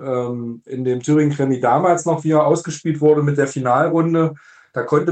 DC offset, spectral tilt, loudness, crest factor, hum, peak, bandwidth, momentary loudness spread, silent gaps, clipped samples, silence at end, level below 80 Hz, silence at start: under 0.1%; -7 dB/octave; -18 LUFS; 14 dB; none; -4 dBFS; 9 kHz; 10 LU; none; under 0.1%; 0 s; -62 dBFS; 0 s